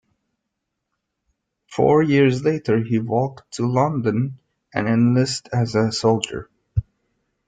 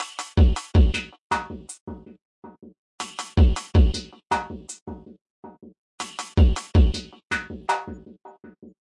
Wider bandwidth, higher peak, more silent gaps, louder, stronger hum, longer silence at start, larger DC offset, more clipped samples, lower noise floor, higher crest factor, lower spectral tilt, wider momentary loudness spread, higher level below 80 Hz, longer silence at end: second, 9.4 kHz vs 11.5 kHz; first, -4 dBFS vs -8 dBFS; second, none vs 1.21-1.30 s, 1.81-1.87 s, 2.25-2.42 s, 2.78-2.98 s, 4.82-4.86 s, 5.21-5.43 s, 5.78-5.98 s; first, -20 LUFS vs -23 LUFS; neither; first, 1.7 s vs 0 s; neither; neither; first, -79 dBFS vs -47 dBFS; about the same, 18 dB vs 16 dB; about the same, -6.5 dB/octave vs -6 dB/octave; second, 11 LU vs 18 LU; second, -46 dBFS vs -26 dBFS; about the same, 0.65 s vs 0.55 s